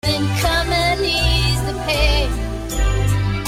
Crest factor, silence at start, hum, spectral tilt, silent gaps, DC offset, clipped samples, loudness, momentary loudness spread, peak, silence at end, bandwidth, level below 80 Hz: 14 dB; 0.05 s; none; -4.5 dB/octave; none; under 0.1%; under 0.1%; -18 LUFS; 6 LU; -4 dBFS; 0 s; 16 kHz; -22 dBFS